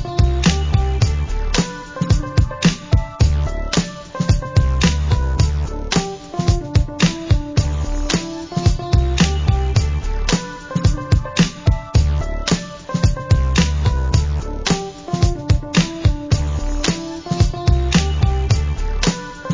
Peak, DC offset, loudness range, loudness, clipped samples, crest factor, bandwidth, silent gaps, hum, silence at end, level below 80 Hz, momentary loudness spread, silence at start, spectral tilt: -2 dBFS; under 0.1%; 1 LU; -19 LUFS; under 0.1%; 14 dB; 7.6 kHz; none; none; 0 s; -20 dBFS; 6 LU; 0 s; -5.5 dB/octave